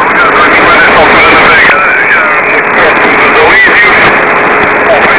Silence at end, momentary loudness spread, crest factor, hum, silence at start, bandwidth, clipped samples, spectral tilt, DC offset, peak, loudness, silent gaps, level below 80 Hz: 0 s; 4 LU; 4 dB; none; 0 s; 4 kHz; 6%; -7 dB/octave; 1%; 0 dBFS; -3 LUFS; none; -32 dBFS